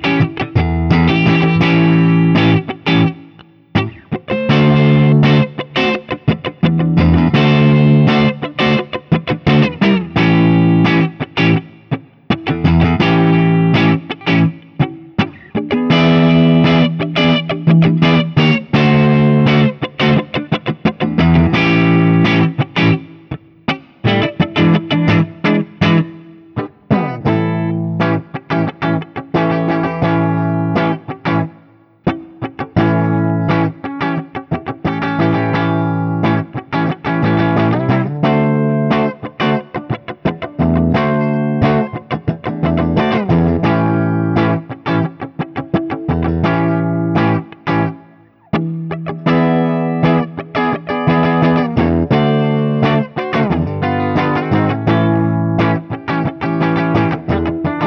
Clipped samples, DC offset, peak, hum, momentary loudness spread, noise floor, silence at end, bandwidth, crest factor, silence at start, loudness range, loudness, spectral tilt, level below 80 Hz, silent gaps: under 0.1%; under 0.1%; 0 dBFS; none; 10 LU; -46 dBFS; 0 s; 6.2 kHz; 14 dB; 0 s; 5 LU; -14 LUFS; -8.5 dB/octave; -36 dBFS; none